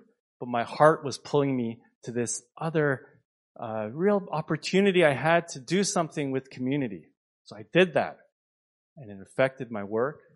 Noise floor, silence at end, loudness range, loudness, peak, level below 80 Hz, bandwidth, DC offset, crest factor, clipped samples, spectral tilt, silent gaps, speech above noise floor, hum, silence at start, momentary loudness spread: under -90 dBFS; 0.2 s; 4 LU; -27 LUFS; -4 dBFS; -72 dBFS; 11.5 kHz; under 0.1%; 24 dB; under 0.1%; -5 dB/octave; 1.95-2.02 s, 3.25-3.55 s, 7.17-7.45 s, 8.32-8.96 s; over 63 dB; none; 0.4 s; 14 LU